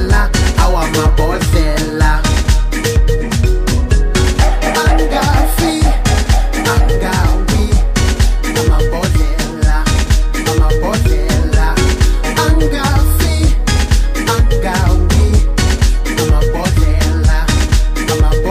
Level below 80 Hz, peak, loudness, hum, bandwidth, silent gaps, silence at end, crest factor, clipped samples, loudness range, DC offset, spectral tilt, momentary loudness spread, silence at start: -12 dBFS; 0 dBFS; -13 LUFS; none; 15.5 kHz; none; 0 s; 10 dB; under 0.1%; 1 LU; under 0.1%; -5 dB/octave; 2 LU; 0 s